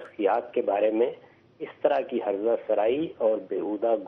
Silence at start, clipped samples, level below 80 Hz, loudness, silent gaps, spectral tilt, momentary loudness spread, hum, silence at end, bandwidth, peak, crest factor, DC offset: 0 s; under 0.1%; -74 dBFS; -26 LUFS; none; -4 dB/octave; 5 LU; none; 0 s; 4.3 kHz; -8 dBFS; 18 dB; under 0.1%